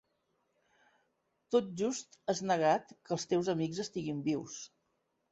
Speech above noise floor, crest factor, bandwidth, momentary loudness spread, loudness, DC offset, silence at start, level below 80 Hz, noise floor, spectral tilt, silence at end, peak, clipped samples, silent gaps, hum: 46 dB; 20 dB; 8 kHz; 10 LU; -34 LUFS; under 0.1%; 1.5 s; -76 dBFS; -80 dBFS; -5 dB/octave; 0.65 s; -16 dBFS; under 0.1%; none; none